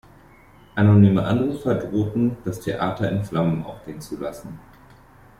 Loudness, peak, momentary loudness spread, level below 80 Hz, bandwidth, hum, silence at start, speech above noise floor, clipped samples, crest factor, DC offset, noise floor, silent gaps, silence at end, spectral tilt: -21 LUFS; -4 dBFS; 19 LU; -50 dBFS; 13 kHz; none; 0.75 s; 29 dB; under 0.1%; 18 dB; under 0.1%; -50 dBFS; none; 0.8 s; -8.5 dB/octave